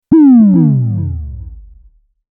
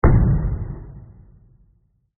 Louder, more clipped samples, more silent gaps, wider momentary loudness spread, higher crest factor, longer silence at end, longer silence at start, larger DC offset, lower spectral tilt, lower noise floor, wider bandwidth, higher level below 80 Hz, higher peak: first, -9 LUFS vs -21 LUFS; neither; neither; second, 21 LU vs 24 LU; second, 10 dB vs 18 dB; second, 0.75 s vs 1.1 s; about the same, 0.1 s vs 0.05 s; neither; first, -15 dB/octave vs -8 dB/octave; second, -45 dBFS vs -61 dBFS; about the same, 2.4 kHz vs 2.3 kHz; second, -32 dBFS vs -24 dBFS; first, 0 dBFS vs -4 dBFS